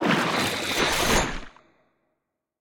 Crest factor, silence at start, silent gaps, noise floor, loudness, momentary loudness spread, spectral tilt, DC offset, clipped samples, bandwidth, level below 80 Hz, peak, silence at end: 18 dB; 0 s; none; -80 dBFS; -23 LUFS; 8 LU; -3 dB/octave; under 0.1%; under 0.1%; 18 kHz; -40 dBFS; -8 dBFS; 1.1 s